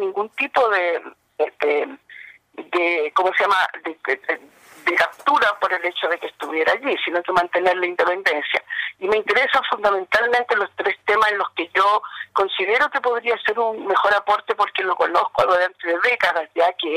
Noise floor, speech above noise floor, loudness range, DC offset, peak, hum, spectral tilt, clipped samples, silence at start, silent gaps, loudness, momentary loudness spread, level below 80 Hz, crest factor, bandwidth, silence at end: -43 dBFS; 23 dB; 2 LU; under 0.1%; -6 dBFS; none; -3 dB/octave; under 0.1%; 0 s; none; -20 LUFS; 8 LU; -64 dBFS; 14 dB; 15.5 kHz; 0 s